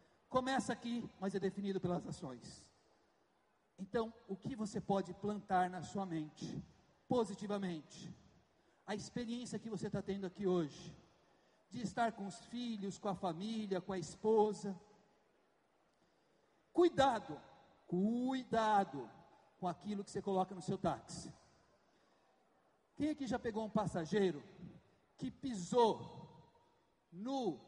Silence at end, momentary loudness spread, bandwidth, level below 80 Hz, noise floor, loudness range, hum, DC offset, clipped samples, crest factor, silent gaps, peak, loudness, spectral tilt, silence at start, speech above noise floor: 0.05 s; 18 LU; 11 kHz; -72 dBFS; -77 dBFS; 6 LU; none; under 0.1%; under 0.1%; 20 dB; none; -20 dBFS; -40 LUFS; -6 dB/octave; 0.3 s; 38 dB